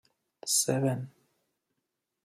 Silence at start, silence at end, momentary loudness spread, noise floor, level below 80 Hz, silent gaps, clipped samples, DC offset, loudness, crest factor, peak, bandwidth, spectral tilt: 0.45 s; 1.15 s; 16 LU; -84 dBFS; -76 dBFS; none; under 0.1%; under 0.1%; -28 LUFS; 20 dB; -14 dBFS; 14 kHz; -3.5 dB/octave